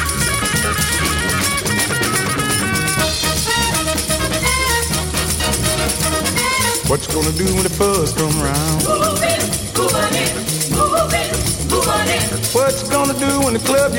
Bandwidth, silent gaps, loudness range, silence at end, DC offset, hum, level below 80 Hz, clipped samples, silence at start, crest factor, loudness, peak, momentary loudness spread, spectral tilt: 17 kHz; none; 0 LU; 0 s; under 0.1%; none; -30 dBFS; under 0.1%; 0 s; 16 dB; -16 LUFS; -2 dBFS; 2 LU; -3 dB/octave